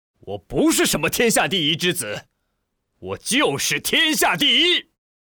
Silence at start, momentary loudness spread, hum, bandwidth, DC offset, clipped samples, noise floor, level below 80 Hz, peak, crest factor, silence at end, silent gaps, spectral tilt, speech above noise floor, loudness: 0.25 s; 15 LU; none; over 20 kHz; under 0.1%; under 0.1%; -74 dBFS; -50 dBFS; -6 dBFS; 14 dB; 0.5 s; none; -2.5 dB/octave; 54 dB; -18 LUFS